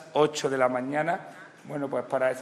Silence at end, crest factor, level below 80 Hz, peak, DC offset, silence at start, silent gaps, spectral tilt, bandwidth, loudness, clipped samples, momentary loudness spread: 0 s; 18 dB; -80 dBFS; -10 dBFS; under 0.1%; 0 s; none; -4.5 dB/octave; 13 kHz; -28 LUFS; under 0.1%; 13 LU